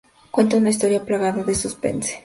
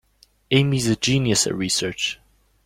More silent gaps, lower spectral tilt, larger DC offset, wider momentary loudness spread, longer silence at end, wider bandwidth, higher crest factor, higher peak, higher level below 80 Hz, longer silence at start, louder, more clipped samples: neither; about the same, -4.5 dB/octave vs -4 dB/octave; neither; about the same, 7 LU vs 8 LU; second, 0.05 s vs 0.5 s; second, 11.5 kHz vs 16 kHz; about the same, 16 dB vs 18 dB; about the same, -4 dBFS vs -4 dBFS; about the same, -48 dBFS vs -50 dBFS; second, 0.35 s vs 0.5 s; about the same, -20 LUFS vs -20 LUFS; neither